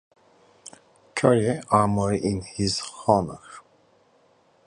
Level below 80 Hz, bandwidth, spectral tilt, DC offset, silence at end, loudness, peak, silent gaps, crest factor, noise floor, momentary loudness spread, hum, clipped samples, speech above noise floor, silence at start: -50 dBFS; 11 kHz; -5.5 dB/octave; under 0.1%; 1.1 s; -23 LUFS; -2 dBFS; none; 22 dB; -61 dBFS; 25 LU; none; under 0.1%; 38 dB; 1.15 s